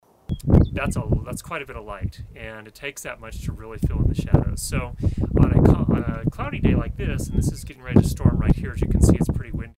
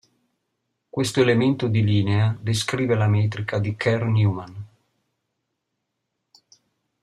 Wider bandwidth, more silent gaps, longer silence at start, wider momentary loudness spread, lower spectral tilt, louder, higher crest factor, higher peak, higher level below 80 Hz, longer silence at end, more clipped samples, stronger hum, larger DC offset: first, 16 kHz vs 12 kHz; neither; second, 0.3 s vs 0.95 s; first, 15 LU vs 8 LU; about the same, -7 dB/octave vs -6.5 dB/octave; about the same, -22 LUFS vs -22 LUFS; about the same, 22 dB vs 18 dB; first, 0 dBFS vs -6 dBFS; first, -28 dBFS vs -58 dBFS; second, 0.05 s vs 2.35 s; neither; neither; neither